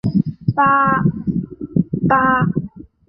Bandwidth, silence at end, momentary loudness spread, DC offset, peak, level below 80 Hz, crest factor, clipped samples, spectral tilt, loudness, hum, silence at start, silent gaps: 5.4 kHz; 0.25 s; 10 LU; under 0.1%; 0 dBFS; -44 dBFS; 16 dB; under 0.1%; -10.5 dB/octave; -17 LUFS; none; 0.05 s; none